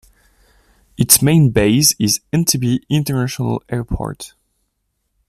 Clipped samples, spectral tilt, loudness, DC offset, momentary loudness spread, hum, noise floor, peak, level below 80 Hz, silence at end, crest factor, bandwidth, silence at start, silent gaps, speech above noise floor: under 0.1%; -4 dB/octave; -15 LUFS; under 0.1%; 14 LU; none; -70 dBFS; 0 dBFS; -38 dBFS; 1 s; 18 dB; 15 kHz; 1 s; none; 55 dB